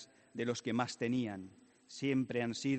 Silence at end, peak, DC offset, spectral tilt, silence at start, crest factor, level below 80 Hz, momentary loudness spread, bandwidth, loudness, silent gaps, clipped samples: 0 s; -18 dBFS; under 0.1%; -5.5 dB/octave; 0 s; 18 dB; -76 dBFS; 14 LU; 8.8 kHz; -37 LUFS; none; under 0.1%